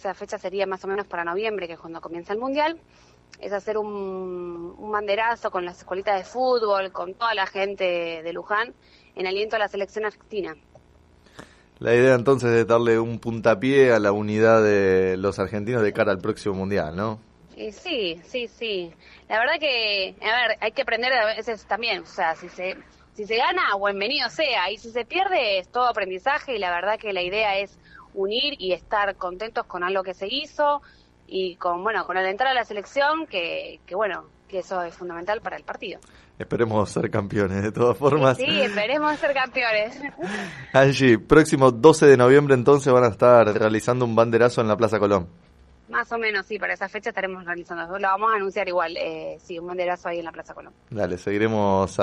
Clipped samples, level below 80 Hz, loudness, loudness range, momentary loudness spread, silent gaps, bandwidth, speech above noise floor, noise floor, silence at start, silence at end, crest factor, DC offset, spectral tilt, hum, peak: under 0.1%; -54 dBFS; -22 LUFS; 11 LU; 15 LU; none; 12 kHz; 32 dB; -54 dBFS; 0.05 s; 0 s; 22 dB; under 0.1%; -5.5 dB/octave; none; 0 dBFS